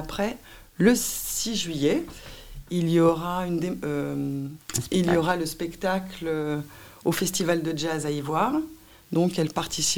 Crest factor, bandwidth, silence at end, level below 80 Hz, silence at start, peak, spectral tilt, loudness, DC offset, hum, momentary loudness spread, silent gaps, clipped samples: 20 dB; 18 kHz; 0 s; -50 dBFS; 0 s; -6 dBFS; -4.5 dB/octave; -26 LUFS; 0.3%; none; 11 LU; none; under 0.1%